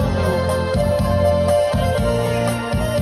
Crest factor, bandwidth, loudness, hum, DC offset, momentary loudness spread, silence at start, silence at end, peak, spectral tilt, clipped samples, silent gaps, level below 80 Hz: 12 dB; 14 kHz; -18 LUFS; none; under 0.1%; 4 LU; 0 s; 0 s; -6 dBFS; -6.5 dB/octave; under 0.1%; none; -30 dBFS